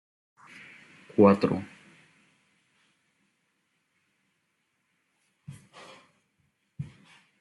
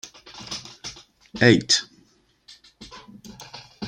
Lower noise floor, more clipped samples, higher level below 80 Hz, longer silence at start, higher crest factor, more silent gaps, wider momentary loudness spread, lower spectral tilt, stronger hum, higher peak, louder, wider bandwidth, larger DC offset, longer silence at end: first, -76 dBFS vs -60 dBFS; neither; second, -74 dBFS vs -60 dBFS; first, 1.2 s vs 0.05 s; about the same, 24 dB vs 26 dB; neither; first, 29 LU vs 26 LU; first, -8.5 dB/octave vs -3.5 dB/octave; neither; second, -8 dBFS vs -2 dBFS; second, -24 LUFS vs -20 LUFS; second, 11 kHz vs 13 kHz; neither; first, 0.6 s vs 0 s